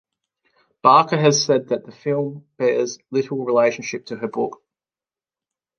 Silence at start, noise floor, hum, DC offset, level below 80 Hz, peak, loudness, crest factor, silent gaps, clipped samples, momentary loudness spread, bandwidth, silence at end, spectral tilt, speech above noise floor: 0.85 s; under -90 dBFS; none; under 0.1%; -72 dBFS; -2 dBFS; -20 LUFS; 20 dB; none; under 0.1%; 14 LU; 10 kHz; 1.25 s; -4.5 dB/octave; over 71 dB